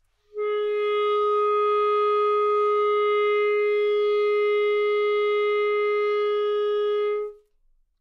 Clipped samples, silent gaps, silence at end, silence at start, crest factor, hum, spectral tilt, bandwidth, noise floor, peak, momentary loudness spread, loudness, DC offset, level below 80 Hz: under 0.1%; none; 0.65 s; 0.35 s; 8 dB; none; -3 dB/octave; 5.2 kHz; -63 dBFS; -14 dBFS; 4 LU; -23 LUFS; under 0.1%; -64 dBFS